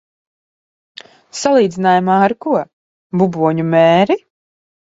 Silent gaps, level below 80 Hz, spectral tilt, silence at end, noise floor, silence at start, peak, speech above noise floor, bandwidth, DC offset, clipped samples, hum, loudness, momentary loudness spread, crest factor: 2.73-3.10 s; -58 dBFS; -6 dB/octave; 0.7 s; under -90 dBFS; 1.35 s; 0 dBFS; over 77 dB; 8 kHz; under 0.1%; under 0.1%; none; -14 LUFS; 9 LU; 16 dB